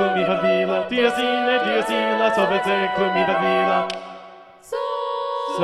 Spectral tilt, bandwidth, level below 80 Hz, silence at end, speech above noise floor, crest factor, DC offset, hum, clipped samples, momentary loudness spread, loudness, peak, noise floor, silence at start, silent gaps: -5 dB/octave; 13 kHz; -60 dBFS; 0 s; 24 dB; 14 dB; under 0.1%; none; under 0.1%; 9 LU; -20 LUFS; -6 dBFS; -43 dBFS; 0 s; none